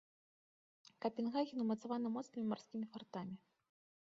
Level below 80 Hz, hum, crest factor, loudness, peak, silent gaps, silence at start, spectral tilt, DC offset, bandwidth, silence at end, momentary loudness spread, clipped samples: -88 dBFS; none; 18 dB; -43 LUFS; -26 dBFS; none; 1 s; -6 dB/octave; under 0.1%; 7.4 kHz; 0.65 s; 9 LU; under 0.1%